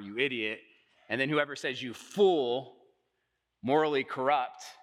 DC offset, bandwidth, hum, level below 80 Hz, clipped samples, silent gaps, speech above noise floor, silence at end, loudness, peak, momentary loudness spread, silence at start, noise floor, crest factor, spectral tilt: under 0.1%; 13 kHz; none; -84 dBFS; under 0.1%; none; 51 dB; 0.1 s; -30 LUFS; -12 dBFS; 12 LU; 0 s; -81 dBFS; 20 dB; -5 dB/octave